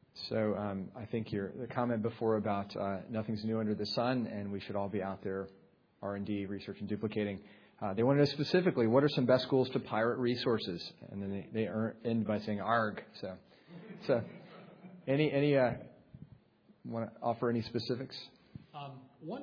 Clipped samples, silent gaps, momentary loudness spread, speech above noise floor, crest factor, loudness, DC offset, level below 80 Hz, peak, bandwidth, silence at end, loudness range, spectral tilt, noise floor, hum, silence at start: under 0.1%; none; 19 LU; 32 dB; 22 dB; -34 LUFS; under 0.1%; -72 dBFS; -14 dBFS; 5.4 kHz; 0 s; 8 LU; -5.5 dB/octave; -65 dBFS; none; 0.15 s